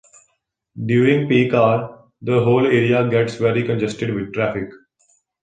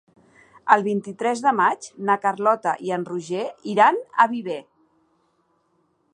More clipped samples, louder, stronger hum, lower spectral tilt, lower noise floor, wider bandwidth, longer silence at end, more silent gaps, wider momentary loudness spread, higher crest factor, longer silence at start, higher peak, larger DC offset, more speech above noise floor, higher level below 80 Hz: neither; first, -18 LUFS vs -21 LUFS; neither; first, -7.5 dB/octave vs -5 dB/octave; about the same, -70 dBFS vs -67 dBFS; about the same, 9.2 kHz vs 10 kHz; second, 0.65 s vs 1.55 s; neither; about the same, 13 LU vs 11 LU; second, 16 dB vs 22 dB; about the same, 0.75 s vs 0.65 s; about the same, -2 dBFS vs -2 dBFS; neither; first, 53 dB vs 46 dB; first, -54 dBFS vs -76 dBFS